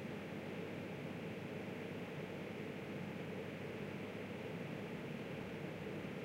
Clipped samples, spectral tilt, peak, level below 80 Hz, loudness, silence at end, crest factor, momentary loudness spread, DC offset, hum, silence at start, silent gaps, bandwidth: under 0.1%; -6.5 dB/octave; -32 dBFS; -74 dBFS; -47 LUFS; 0 s; 14 dB; 1 LU; under 0.1%; none; 0 s; none; 16 kHz